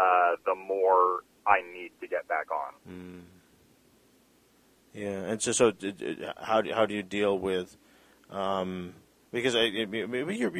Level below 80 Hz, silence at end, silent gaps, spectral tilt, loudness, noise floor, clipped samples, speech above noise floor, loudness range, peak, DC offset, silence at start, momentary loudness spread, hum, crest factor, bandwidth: -66 dBFS; 0 s; none; -3.5 dB/octave; -29 LUFS; -63 dBFS; under 0.1%; 34 dB; 9 LU; -6 dBFS; under 0.1%; 0 s; 17 LU; none; 22 dB; 15 kHz